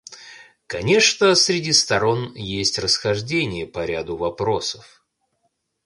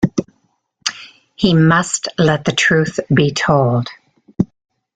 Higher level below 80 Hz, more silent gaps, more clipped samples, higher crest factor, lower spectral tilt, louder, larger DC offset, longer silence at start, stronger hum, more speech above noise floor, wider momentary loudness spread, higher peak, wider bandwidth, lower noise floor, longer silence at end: about the same, -50 dBFS vs -46 dBFS; neither; neither; about the same, 18 dB vs 16 dB; second, -3 dB/octave vs -5 dB/octave; second, -19 LUFS vs -16 LUFS; neither; about the same, 0.1 s vs 0 s; neither; about the same, 51 dB vs 49 dB; about the same, 13 LU vs 11 LU; second, -4 dBFS vs 0 dBFS; first, 11.5 kHz vs 9.6 kHz; first, -71 dBFS vs -63 dBFS; first, 1.05 s vs 0.5 s